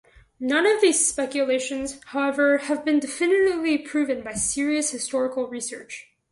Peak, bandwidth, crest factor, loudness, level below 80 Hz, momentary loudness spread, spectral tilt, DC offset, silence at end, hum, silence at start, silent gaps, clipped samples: -8 dBFS; 11.5 kHz; 16 dB; -23 LUFS; -58 dBFS; 12 LU; -2 dB/octave; under 0.1%; 0.3 s; none; 0.4 s; none; under 0.1%